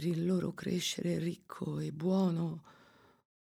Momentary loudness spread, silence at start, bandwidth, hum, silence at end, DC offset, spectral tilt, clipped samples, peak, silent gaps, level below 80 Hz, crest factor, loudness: 9 LU; 0 s; 15 kHz; none; 0.85 s; under 0.1%; -6 dB/octave; under 0.1%; -22 dBFS; none; -70 dBFS; 14 dB; -35 LUFS